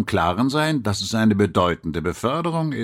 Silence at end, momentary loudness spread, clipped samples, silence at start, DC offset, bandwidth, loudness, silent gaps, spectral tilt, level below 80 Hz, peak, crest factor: 0 s; 6 LU; under 0.1%; 0 s; under 0.1%; 16 kHz; -21 LUFS; none; -5.5 dB/octave; -46 dBFS; -4 dBFS; 16 dB